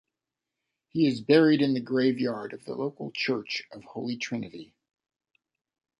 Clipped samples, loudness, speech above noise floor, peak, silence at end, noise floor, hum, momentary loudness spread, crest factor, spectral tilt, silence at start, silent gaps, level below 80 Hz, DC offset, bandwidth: under 0.1%; -27 LUFS; 61 dB; -8 dBFS; 1.35 s; -88 dBFS; none; 16 LU; 22 dB; -6 dB/octave; 0.95 s; none; -72 dBFS; under 0.1%; 11 kHz